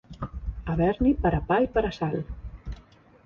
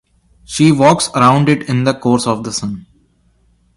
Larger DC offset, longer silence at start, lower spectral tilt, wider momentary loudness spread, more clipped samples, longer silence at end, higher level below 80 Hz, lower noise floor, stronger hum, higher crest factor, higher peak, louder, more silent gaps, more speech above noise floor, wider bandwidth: neither; second, 0.1 s vs 0.5 s; first, -9 dB/octave vs -5.5 dB/octave; first, 18 LU vs 13 LU; neither; second, 0.45 s vs 0.95 s; first, -38 dBFS vs -48 dBFS; about the same, -53 dBFS vs -55 dBFS; neither; about the same, 16 dB vs 14 dB; second, -10 dBFS vs 0 dBFS; second, -26 LUFS vs -13 LUFS; neither; second, 29 dB vs 42 dB; second, 7 kHz vs 11.5 kHz